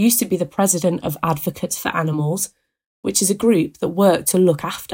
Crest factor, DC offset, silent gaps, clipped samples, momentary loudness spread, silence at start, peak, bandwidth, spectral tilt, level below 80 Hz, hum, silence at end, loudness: 16 dB; under 0.1%; 2.86-3.03 s; under 0.1%; 8 LU; 0 s; -2 dBFS; 17 kHz; -4.5 dB/octave; -56 dBFS; none; 0 s; -19 LUFS